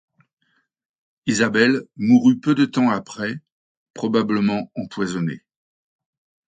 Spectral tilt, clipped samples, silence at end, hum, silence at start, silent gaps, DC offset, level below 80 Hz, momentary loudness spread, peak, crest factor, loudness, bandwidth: -5.5 dB/octave; under 0.1%; 1.1 s; none; 1.25 s; 3.52-3.94 s; under 0.1%; -64 dBFS; 13 LU; -4 dBFS; 18 dB; -20 LUFS; 9.2 kHz